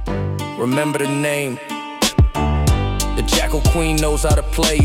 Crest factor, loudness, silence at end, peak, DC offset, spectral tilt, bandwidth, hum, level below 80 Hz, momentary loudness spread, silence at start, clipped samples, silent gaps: 14 dB; -18 LUFS; 0 s; -4 dBFS; under 0.1%; -4.5 dB/octave; 17 kHz; none; -22 dBFS; 7 LU; 0 s; under 0.1%; none